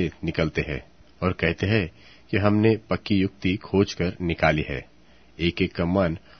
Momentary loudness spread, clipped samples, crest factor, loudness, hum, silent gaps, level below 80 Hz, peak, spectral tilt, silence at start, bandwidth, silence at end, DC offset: 7 LU; under 0.1%; 20 dB; -24 LUFS; none; none; -44 dBFS; -4 dBFS; -7 dB/octave; 0 s; 6.6 kHz; 0.2 s; 0.2%